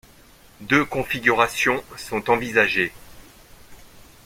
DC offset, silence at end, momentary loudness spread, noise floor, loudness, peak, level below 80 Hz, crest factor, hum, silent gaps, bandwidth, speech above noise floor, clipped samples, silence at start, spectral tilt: under 0.1%; 0.4 s; 9 LU; -50 dBFS; -21 LUFS; -2 dBFS; -52 dBFS; 22 dB; none; none; 16.5 kHz; 29 dB; under 0.1%; 0.6 s; -4 dB/octave